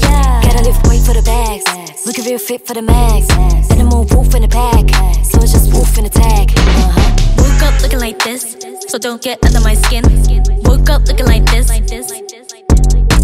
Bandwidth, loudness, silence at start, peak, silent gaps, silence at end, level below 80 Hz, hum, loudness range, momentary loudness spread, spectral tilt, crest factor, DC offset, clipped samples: 16 kHz; -12 LUFS; 0 s; 0 dBFS; none; 0 s; -10 dBFS; none; 2 LU; 8 LU; -5 dB/octave; 8 dB; under 0.1%; under 0.1%